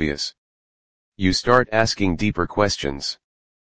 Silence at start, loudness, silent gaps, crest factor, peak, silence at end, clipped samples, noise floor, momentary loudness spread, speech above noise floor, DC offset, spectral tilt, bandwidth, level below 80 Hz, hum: 0 s; -21 LUFS; 0.38-1.12 s; 22 dB; 0 dBFS; 0.5 s; under 0.1%; under -90 dBFS; 12 LU; over 69 dB; 1%; -4.5 dB/octave; 10 kHz; -42 dBFS; none